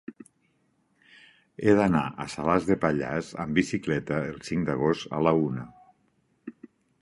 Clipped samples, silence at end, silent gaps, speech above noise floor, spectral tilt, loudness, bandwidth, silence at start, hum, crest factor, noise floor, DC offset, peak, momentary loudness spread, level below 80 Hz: under 0.1%; 0.35 s; none; 44 dB; -6.5 dB/octave; -26 LUFS; 11.5 kHz; 0.1 s; none; 22 dB; -70 dBFS; under 0.1%; -6 dBFS; 23 LU; -54 dBFS